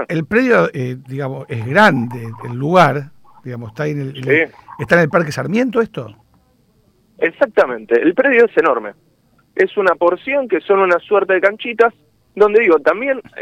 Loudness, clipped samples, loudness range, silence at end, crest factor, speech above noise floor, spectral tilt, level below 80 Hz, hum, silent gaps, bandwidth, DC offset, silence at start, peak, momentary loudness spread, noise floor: -15 LUFS; under 0.1%; 3 LU; 0 s; 14 dB; 41 dB; -7 dB/octave; -56 dBFS; none; none; 14.5 kHz; under 0.1%; 0 s; -2 dBFS; 14 LU; -56 dBFS